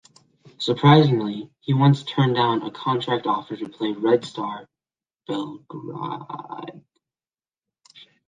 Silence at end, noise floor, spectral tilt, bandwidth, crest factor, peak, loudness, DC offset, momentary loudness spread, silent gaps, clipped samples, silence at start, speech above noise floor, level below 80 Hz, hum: 1.5 s; under -90 dBFS; -7.5 dB/octave; 7.6 kHz; 20 dB; -2 dBFS; -22 LUFS; under 0.1%; 19 LU; none; under 0.1%; 0.6 s; over 68 dB; -62 dBFS; none